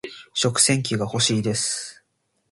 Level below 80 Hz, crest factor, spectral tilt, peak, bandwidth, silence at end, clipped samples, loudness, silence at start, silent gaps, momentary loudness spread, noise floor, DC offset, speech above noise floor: -58 dBFS; 20 dB; -3 dB/octave; -4 dBFS; 11.5 kHz; 0.6 s; under 0.1%; -21 LUFS; 0.05 s; none; 12 LU; -71 dBFS; under 0.1%; 49 dB